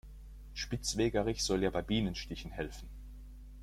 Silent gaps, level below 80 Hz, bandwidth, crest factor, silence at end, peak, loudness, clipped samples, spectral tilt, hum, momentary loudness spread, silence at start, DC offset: none; -48 dBFS; 16 kHz; 18 dB; 0 s; -18 dBFS; -35 LUFS; under 0.1%; -4.5 dB/octave; none; 21 LU; 0.05 s; under 0.1%